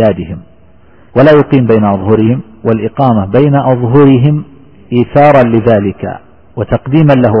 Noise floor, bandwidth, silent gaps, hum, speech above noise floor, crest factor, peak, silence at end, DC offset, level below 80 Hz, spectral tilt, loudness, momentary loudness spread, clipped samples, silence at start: -43 dBFS; 5.6 kHz; none; none; 35 dB; 8 dB; 0 dBFS; 0 s; under 0.1%; -36 dBFS; -10.5 dB/octave; -9 LUFS; 14 LU; 0.5%; 0 s